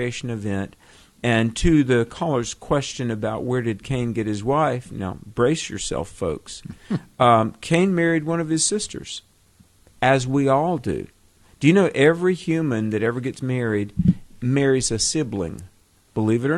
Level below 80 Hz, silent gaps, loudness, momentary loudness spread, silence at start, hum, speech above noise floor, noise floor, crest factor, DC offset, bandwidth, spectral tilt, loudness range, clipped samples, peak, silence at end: -42 dBFS; none; -22 LUFS; 12 LU; 0 s; none; 35 dB; -56 dBFS; 20 dB; under 0.1%; 12.5 kHz; -5 dB/octave; 4 LU; under 0.1%; -2 dBFS; 0 s